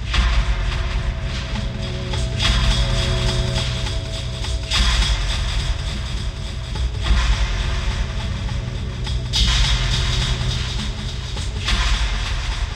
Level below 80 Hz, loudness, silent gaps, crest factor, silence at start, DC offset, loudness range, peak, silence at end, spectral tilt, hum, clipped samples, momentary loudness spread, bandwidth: -22 dBFS; -22 LUFS; none; 16 dB; 0 s; under 0.1%; 3 LU; -4 dBFS; 0 s; -4 dB/octave; none; under 0.1%; 8 LU; 10.5 kHz